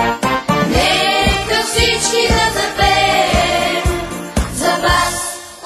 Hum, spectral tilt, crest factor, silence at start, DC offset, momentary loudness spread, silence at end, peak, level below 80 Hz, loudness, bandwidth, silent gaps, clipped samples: none; -3 dB/octave; 14 dB; 0 s; under 0.1%; 8 LU; 0 s; 0 dBFS; -26 dBFS; -14 LUFS; 16 kHz; none; under 0.1%